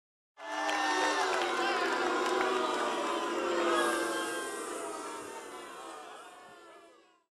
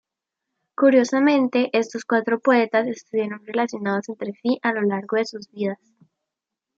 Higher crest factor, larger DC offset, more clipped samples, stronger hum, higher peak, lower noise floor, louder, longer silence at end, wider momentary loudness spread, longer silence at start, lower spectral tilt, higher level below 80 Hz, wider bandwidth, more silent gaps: about the same, 18 dB vs 18 dB; neither; neither; neither; second, -16 dBFS vs -4 dBFS; second, -60 dBFS vs -85 dBFS; second, -32 LUFS vs -22 LUFS; second, 0.45 s vs 1.05 s; first, 17 LU vs 11 LU; second, 0.4 s vs 0.8 s; second, -1.5 dB/octave vs -5.5 dB/octave; about the same, -74 dBFS vs -76 dBFS; first, 15 kHz vs 7.8 kHz; neither